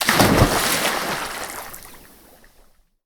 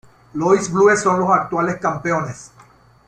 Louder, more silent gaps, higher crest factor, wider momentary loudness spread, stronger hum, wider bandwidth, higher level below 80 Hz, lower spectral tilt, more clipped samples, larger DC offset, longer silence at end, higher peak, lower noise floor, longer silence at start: about the same, -19 LUFS vs -17 LUFS; neither; first, 22 dB vs 16 dB; first, 19 LU vs 14 LU; neither; first, over 20 kHz vs 9.8 kHz; first, -36 dBFS vs -56 dBFS; second, -3.5 dB/octave vs -5.5 dB/octave; neither; neither; first, 1.1 s vs 0.6 s; about the same, 0 dBFS vs -2 dBFS; first, -54 dBFS vs -49 dBFS; second, 0 s vs 0.35 s